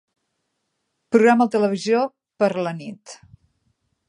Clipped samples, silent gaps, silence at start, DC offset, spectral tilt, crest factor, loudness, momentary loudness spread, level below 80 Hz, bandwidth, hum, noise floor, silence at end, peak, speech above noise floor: under 0.1%; none; 1.1 s; under 0.1%; -6 dB/octave; 20 dB; -20 LUFS; 18 LU; -70 dBFS; 11 kHz; none; -75 dBFS; 0.95 s; -2 dBFS; 56 dB